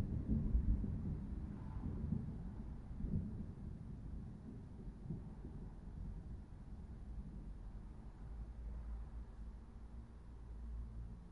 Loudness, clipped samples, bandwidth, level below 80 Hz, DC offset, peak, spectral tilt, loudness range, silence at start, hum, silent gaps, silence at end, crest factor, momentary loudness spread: -48 LUFS; under 0.1%; 4.7 kHz; -48 dBFS; under 0.1%; -24 dBFS; -10 dB/octave; 9 LU; 0 s; none; none; 0 s; 20 dB; 14 LU